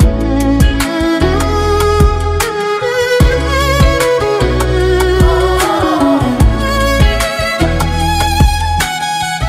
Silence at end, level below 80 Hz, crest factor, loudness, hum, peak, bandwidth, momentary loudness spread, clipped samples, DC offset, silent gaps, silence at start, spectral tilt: 0 s; -16 dBFS; 10 dB; -12 LUFS; none; 0 dBFS; 16 kHz; 4 LU; under 0.1%; under 0.1%; none; 0 s; -5.5 dB/octave